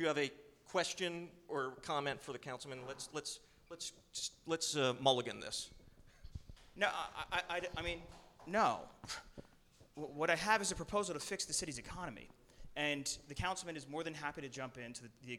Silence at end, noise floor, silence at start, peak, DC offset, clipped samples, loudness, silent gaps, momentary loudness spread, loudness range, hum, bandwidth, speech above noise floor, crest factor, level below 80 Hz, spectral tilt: 0 s; -66 dBFS; 0 s; -16 dBFS; under 0.1%; under 0.1%; -40 LUFS; none; 17 LU; 4 LU; none; 17.5 kHz; 26 dB; 24 dB; -62 dBFS; -2.5 dB/octave